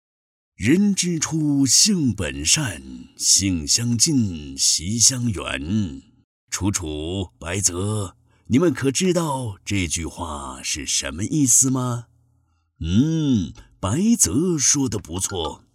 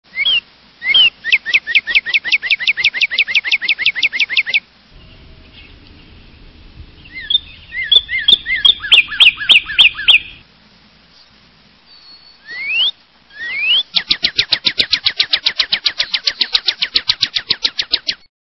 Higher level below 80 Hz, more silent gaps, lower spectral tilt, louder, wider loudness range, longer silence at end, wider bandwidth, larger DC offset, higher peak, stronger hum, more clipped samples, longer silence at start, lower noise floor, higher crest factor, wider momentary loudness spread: about the same, -44 dBFS vs -48 dBFS; first, 6.24-6.48 s vs none; first, -3.5 dB/octave vs 0 dB/octave; second, -20 LUFS vs -12 LUFS; second, 5 LU vs 10 LU; about the same, 0.2 s vs 0.25 s; first, 16.5 kHz vs 11 kHz; neither; about the same, 0 dBFS vs 0 dBFS; neither; neither; first, 0.6 s vs 0.15 s; first, -64 dBFS vs -48 dBFS; about the same, 20 dB vs 16 dB; first, 13 LU vs 8 LU